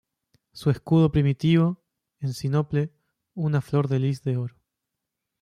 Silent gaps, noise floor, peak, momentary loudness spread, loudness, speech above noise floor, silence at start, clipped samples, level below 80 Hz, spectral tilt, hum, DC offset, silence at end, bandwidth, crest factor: none; -84 dBFS; -10 dBFS; 13 LU; -24 LUFS; 61 dB; 0.55 s; under 0.1%; -52 dBFS; -8 dB/octave; none; under 0.1%; 0.9 s; 11.5 kHz; 16 dB